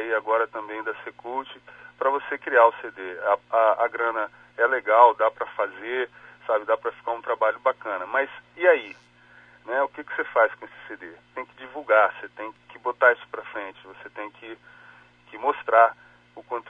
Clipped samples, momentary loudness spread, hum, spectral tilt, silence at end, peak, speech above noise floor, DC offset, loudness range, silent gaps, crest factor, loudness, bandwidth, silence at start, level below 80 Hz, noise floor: under 0.1%; 20 LU; 60 Hz at -65 dBFS; -5 dB/octave; 0.1 s; -2 dBFS; 29 dB; under 0.1%; 5 LU; none; 22 dB; -23 LUFS; 3.9 kHz; 0 s; -74 dBFS; -53 dBFS